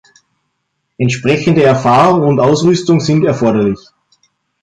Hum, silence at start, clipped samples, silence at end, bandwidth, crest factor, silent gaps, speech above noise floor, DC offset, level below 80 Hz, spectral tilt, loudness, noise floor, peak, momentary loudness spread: none; 1 s; under 0.1%; 0.85 s; 9.8 kHz; 12 dB; none; 58 dB; under 0.1%; -48 dBFS; -6.5 dB/octave; -11 LUFS; -69 dBFS; 0 dBFS; 8 LU